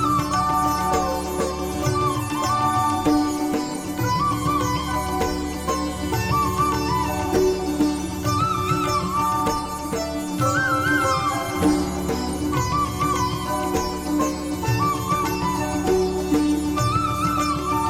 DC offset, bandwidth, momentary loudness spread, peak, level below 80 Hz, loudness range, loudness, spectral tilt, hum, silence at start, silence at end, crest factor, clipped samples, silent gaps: under 0.1%; 17 kHz; 5 LU; -8 dBFS; -38 dBFS; 1 LU; -22 LUFS; -5 dB/octave; none; 0 s; 0 s; 14 dB; under 0.1%; none